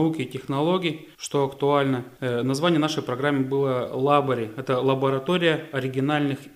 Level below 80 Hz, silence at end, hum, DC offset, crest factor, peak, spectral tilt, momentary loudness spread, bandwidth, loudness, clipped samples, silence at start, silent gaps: -64 dBFS; 0.05 s; none; under 0.1%; 18 dB; -6 dBFS; -6 dB/octave; 7 LU; 15.5 kHz; -24 LUFS; under 0.1%; 0 s; none